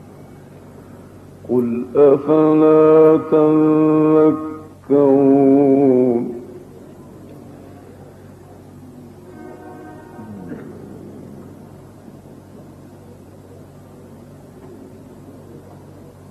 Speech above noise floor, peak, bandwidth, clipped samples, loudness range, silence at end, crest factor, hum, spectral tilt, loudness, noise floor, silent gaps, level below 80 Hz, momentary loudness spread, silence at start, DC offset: 28 dB; -2 dBFS; 8.2 kHz; under 0.1%; 24 LU; 0.75 s; 16 dB; none; -10 dB/octave; -14 LUFS; -40 dBFS; none; -58 dBFS; 26 LU; 1.45 s; under 0.1%